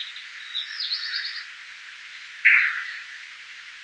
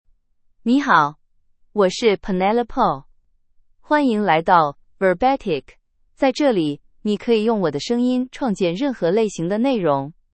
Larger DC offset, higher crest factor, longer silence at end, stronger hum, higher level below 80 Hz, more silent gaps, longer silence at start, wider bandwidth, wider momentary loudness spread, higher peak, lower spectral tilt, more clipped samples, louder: neither; about the same, 24 dB vs 20 dB; second, 0 s vs 0.2 s; neither; second, -84 dBFS vs -50 dBFS; neither; second, 0 s vs 0.65 s; first, 10.5 kHz vs 8.8 kHz; first, 22 LU vs 8 LU; second, -4 dBFS vs 0 dBFS; second, 4.5 dB/octave vs -6 dB/octave; neither; second, -23 LUFS vs -19 LUFS